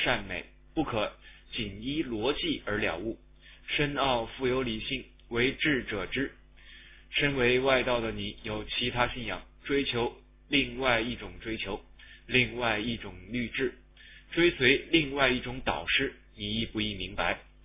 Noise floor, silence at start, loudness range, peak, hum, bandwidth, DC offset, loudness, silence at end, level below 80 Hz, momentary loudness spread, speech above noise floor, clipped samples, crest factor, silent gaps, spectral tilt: -53 dBFS; 0 s; 4 LU; -8 dBFS; none; 3.9 kHz; under 0.1%; -29 LUFS; 0.2 s; -48 dBFS; 12 LU; 23 dB; under 0.1%; 22 dB; none; -2.5 dB/octave